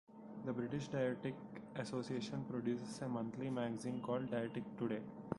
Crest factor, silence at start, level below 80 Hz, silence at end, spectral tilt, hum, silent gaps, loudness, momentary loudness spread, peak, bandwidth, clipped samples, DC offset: 20 dB; 0.1 s; -74 dBFS; 0 s; -6.5 dB/octave; none; none; -43 LUFS; 7 LU; -24 dBFS; 11.5 kHz; under 0.1%; under 0.1%